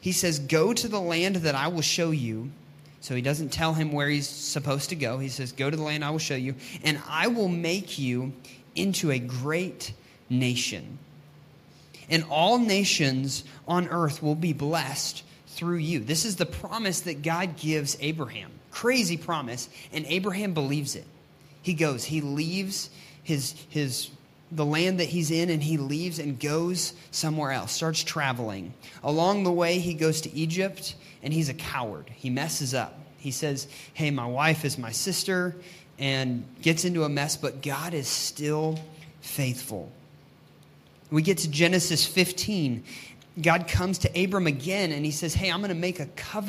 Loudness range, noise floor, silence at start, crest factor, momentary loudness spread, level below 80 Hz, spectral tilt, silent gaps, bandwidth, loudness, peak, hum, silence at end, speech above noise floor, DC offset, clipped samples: 5 LU; -54 dBFS; 0 s; 22 dB; 12 LU; -54 dBFS; -4 dB/octave; none; 15.5 kHz; -27 LUFS; -6 dBFS; none; 0 s; 27 dB; under 0.1%; under 0.1%